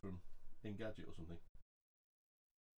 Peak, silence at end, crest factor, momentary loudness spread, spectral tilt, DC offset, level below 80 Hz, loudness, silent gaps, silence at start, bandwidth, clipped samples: -34 dBFS; 1.15 s; 16 dB; 10 LU; -7.5 dB/octave; under 0.1%; -60 dBFS; -54 LUFS; 1.49-1.55 s; 0.05 s; 7.8 kHz; under 0.1%